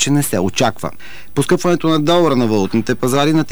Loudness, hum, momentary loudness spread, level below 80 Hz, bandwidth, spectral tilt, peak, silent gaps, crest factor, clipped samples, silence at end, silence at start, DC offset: -15 LUFS; none; 10 LU; -46 dBFS; over 20 kHz; -5 dB/octave; -4 dBFS; none; 10 dB; under 0.1%; 0 s; 0 s; 5%